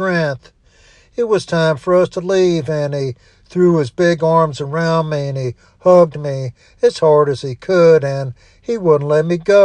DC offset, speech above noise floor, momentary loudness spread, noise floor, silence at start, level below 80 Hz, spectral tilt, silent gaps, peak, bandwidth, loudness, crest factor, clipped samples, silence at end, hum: under 0.1%; 35 dB; 13 LU; -49 dBFS; 0 s; -52 dBFS; -7 dB/octave; none; 0 dBFS; 10 kHz; -15 LUFS; 14 dB; under 0.1%; 0 s; none